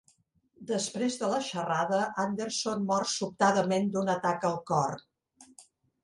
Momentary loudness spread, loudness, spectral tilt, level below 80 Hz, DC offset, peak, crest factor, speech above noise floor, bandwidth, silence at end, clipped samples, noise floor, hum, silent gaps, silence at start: 6 LU; -30 LUFS; -4.5 dB/octave; -70 dBFS; under 0.1%; -12 dBFS; 20 dB; 39 dB; 11.5 kHz; 0.4 s; under 0.1%; -69 dBFS; none; none; 0.6 s